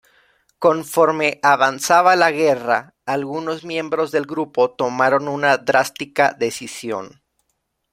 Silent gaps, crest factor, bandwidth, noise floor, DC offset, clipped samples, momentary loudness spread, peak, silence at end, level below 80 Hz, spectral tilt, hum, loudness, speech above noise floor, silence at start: none; 18 dB; 16 kHz; -72 dBFS; under 0.1%; under 0.1%; 10 LU; 0 dBFS; 0.85 s; -66 dBFS; -4 dB/octave; none; -18 LUFS; 54 dB; 0.6 s